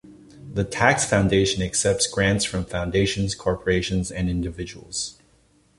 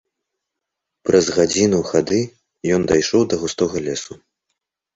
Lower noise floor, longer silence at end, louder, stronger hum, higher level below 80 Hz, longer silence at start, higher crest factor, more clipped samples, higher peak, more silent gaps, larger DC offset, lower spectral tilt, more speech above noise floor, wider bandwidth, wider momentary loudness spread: second, -60 dBFS vs -81 dBFS; second, 0.65 s vs 0.8 s; second, -23 LUFS vs -18 LUFS; neither; first, -40 dBFS vs -48 dBFS; second, 0.05 s vs 1.05 s; about the same, 22 dB vs 18 dB; neither; about the same, -2 dBFS vs -2 dBFS; neither; neither; about the same, -4 dB/octave vs -4.5 dB/octave; second, 37 dB vs 64 dB; first, 11.5 kHz vs 8 kHz; about the same, 10 LU vs 12 LU